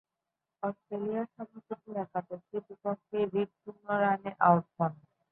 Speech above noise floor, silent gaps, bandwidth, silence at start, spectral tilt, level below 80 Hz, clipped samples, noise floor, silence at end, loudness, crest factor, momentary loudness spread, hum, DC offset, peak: 56 dB; none; 4 kHz; 0.65 s; -11 dB/octave; -76 dBFS; under 0.1%; -88 dBFS; 0.35 s; -32 LUFS; 24 dB; 15 LU; none; under 0.1%; -8 dBFS